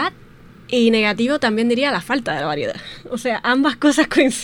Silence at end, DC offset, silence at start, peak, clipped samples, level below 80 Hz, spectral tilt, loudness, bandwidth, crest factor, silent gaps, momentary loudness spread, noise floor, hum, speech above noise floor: 0 s; under 0.1%; 0 s; -2 dBFS; under 0.1%; -50 dBFS; -4 dB/octave; -18 LUFS; 17 kHz; 16 dB; none; 10 LU; -43 dBFS; none; 25 dB